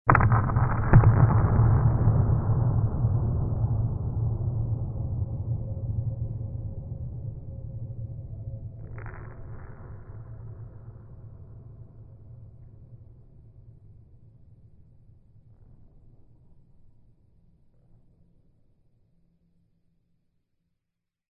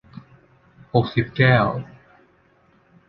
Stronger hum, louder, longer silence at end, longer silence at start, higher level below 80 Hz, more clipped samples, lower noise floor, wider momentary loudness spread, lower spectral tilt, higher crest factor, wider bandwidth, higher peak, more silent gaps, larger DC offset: neither; second, -26 LUFS vs -20 LUFS; first, 7.7 s vs 1.25 s; second, 0.05 s vs 0.95 s; first, -36 dBFS vs -50 dBFS; neither; first, -84 dBFS vs -58 dBFS; first, 26 LU vs 14 LU; first, -13.5 dB/octave vs -9.5 dB/octave; about the same, 26 dB vs 22 dB; second, 2.7 kHz vs 5.6 kHz; about the same, 0 dBFS vs -2 dBFS; neither; neither